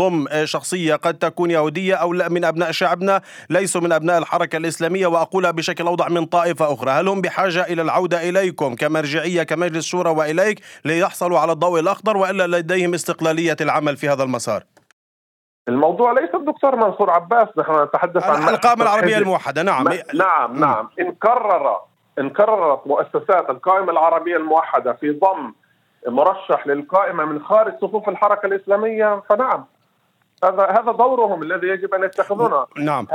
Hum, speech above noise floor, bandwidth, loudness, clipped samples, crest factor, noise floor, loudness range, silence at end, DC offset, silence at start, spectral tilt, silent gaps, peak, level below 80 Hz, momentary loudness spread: none; 46 dB; 16.5 kHz; -18 LUFS; under 0.1%; 18 dB; -63 dBFS; 3 LU; 0 s; under 0.1%; 0 s; -5 dB/octave; 14.93-15.65 s; 0 dBFS; -78 dBFS; 6 LU